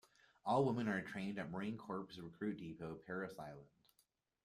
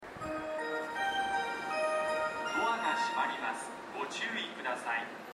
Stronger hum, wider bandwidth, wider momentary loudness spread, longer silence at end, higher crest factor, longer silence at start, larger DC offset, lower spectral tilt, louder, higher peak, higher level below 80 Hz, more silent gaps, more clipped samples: neither; second, 13.5 kHz vs 15.5 kHz; first, 15 LU vs 7 LU; first, 0.8 s vs 0 s; about the same, 20 dB vs 16 dB; first, 0.45 s vs 0 s; neither; first, -7 dB/octave vs -2.5 dB/octave; second, -43 LUFS vs -34 LUFS; second, -24 dBFS vs -20 dBFS; second, -76 dBFS vs -70 dBFS; neither; neither